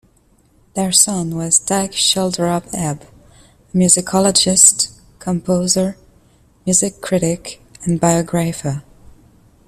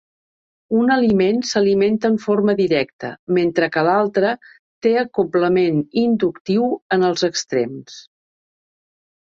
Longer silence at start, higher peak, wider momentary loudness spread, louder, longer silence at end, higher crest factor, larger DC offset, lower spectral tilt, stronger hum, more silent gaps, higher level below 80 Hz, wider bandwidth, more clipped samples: about the same, 0.75 s vs 0.7 s; first, 0 dBFS vs -4 dBFS; first, 14 LU vs 6 LU; first, -15 LUFS vs -18 LUFS; second, 0.85 s vs 1.25 s; about the same, 18 dB vs 16 dB; neither; second, -3.5 dB/octave vs -5.5 dB/octave; neither; second, none vs 2.93-2.99 s, 3.19-3.27 s, 4.59-4.81 s, 6.41-6.45 s, 6.82-6.90 s; first, -48 dBFS vs -58 dBFS; first, 16 kHz vs 7.8 kHz; neither